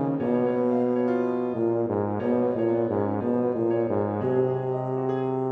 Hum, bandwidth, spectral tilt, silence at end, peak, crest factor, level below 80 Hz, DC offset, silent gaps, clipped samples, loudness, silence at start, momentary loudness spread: none; 4.6 kHz; -10.5 dB/octave; 0 s; -12 dBFS; 12 dB; -66 dBFS; under 0.1%; none; under 0.1%; -25 LUFS; 0 s; 3 LU